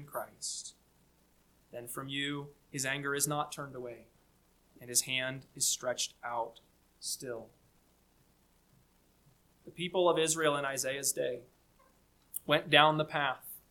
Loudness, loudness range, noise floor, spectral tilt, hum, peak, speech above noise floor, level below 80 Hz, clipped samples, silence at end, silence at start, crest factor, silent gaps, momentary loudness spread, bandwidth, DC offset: -33 LUFS; 11 LU; -68 dBFS; -2.5 dB/octave; none; -8 dBFS; 35 dB; -72 dBFS; under 0.1%; 0.15 s; 0 s; 28 dB; none; 17 LU; 19 kHz; under 0.1%